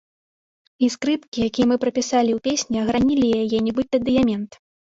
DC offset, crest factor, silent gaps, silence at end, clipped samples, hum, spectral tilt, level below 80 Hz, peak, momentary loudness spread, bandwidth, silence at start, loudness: under 0.1%; 14 dB; 1.28-1.32 s; 0.4 s; under 0.1%; none; -4.5 dB/octave; -50 dBFS; -6 dBFS; 5 LU; 7.8 kHz; 0.8 s; -21 LUFS